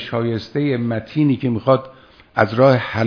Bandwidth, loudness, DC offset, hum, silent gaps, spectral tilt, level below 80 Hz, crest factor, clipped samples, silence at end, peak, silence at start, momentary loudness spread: 5.4 kHz; -18 LUFS; under 0.1%; none; none; -8.5 dB/octave; -54 dBFS; 18 dB; under 0.1%; 0 s; 0 dBFS; 0 s; 8 LU